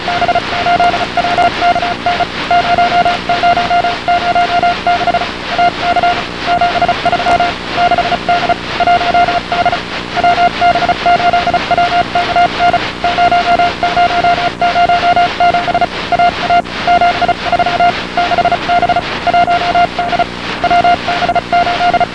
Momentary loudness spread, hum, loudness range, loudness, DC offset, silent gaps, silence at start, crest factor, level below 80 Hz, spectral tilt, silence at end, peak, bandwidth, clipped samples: 4 LU; 60 Hz at -35 dBFS; 1 LU; -12 LUFS; 0.8%; none; 0 s; 12 dB; -34 dBFS; -4.5 dB/octave; 0 s; 0 dBFS; 10 kHz; under 0.1%